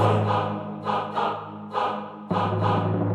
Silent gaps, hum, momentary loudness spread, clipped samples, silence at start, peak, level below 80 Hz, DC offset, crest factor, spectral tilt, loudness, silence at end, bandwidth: none; none; 8 LU; under 0.1%; 0 s; -8 dBFS; -62 dBFS; under 0.1%; 16 dB; -8 dB/octave; -26 LUFS; 0 s; 8.8 kHz